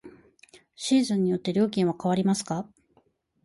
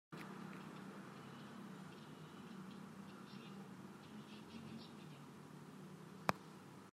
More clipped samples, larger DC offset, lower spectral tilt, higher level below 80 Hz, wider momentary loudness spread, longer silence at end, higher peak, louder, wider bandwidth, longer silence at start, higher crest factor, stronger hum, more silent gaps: neither; neither; about the same, -6 dB/octave vs -5.5 dB/octave; first, -66 dBFS vs -86 dBFS; about the same, 10 LU vs 11 LU; first, 0.8 s vs 0 s; about the same, -12 dBFS vs -14 dBFS; first, -26 LUFS vs -53 LUFS; second, 11.5 kHz vs 16 kHz; about the same, 0.05 s vs 0.1 s; second, 14 dB vs 38 dB; neither; neither